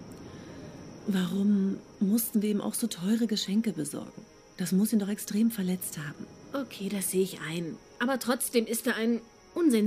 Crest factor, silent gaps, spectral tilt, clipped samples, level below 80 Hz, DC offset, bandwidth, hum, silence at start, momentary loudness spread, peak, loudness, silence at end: 16 dB; none; -5 dB/octave; under 0.1%; -66 dBFS; under 0.1%; 15.5 kHz; none; 0 s; 14 LU; -12 dBFS; -30 LUFS; 0 s